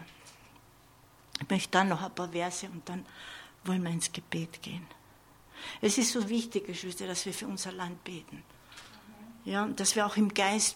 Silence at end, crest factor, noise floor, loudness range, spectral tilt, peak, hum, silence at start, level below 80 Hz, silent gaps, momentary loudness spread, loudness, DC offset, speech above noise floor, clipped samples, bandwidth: 0 s; 24 dB; -59 dBFS; 5 LU; -3.5 dB/octave; -8 dBFS; none; 0 s; -68 dBFS; none; 24 LU; -32 LUFS; under 0.1%; 27 dB; under 0.1%; 17 kHz